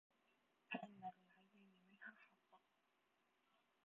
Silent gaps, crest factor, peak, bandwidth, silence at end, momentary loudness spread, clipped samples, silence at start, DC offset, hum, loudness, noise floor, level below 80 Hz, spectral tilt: none; 28 dB; -34 dBFS; 4 kHz; 0.25 s; 9 LU; under 0.1%; 0.7 s; under 0.1%; none; -56 LUFS; -84 dBFS; under -90 dBFS; -3 dB/octave